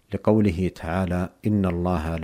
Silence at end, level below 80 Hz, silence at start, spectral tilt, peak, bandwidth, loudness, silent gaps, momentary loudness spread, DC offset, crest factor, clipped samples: 0 s; -40 dBFS; 0.1 s; -8.5 dB/octave; -4 dBFS; 15 kHz; -24 LUFS; none; 6 LU; under 0.1%; 18 dB; under 0.1%